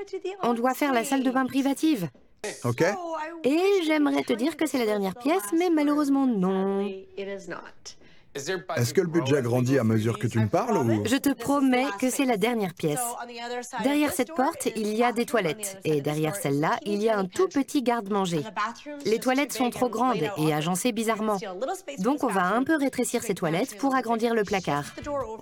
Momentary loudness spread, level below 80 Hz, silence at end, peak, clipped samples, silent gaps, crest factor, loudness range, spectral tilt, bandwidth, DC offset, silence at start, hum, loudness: 9 LU; -64 dBFS; 0 s; -10 dBFS; under 0.1%; none; 16 dB; 3 LU; -5 dB/octave; 18 kHz; under 0.1%; 0 s; none; -26 LUFS